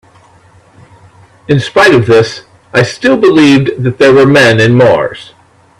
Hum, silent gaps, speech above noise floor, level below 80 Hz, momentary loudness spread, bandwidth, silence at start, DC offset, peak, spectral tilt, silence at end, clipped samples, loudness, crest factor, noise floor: none; none; 36 dB; -44 dBFS; 9 LU; 13 kHz; 1.5 s; under 0.1%; 0 dBFS; -6 dB/octave; 0.55 s; 0.2%; -7 LUFS; 8 dB; -42 dBFS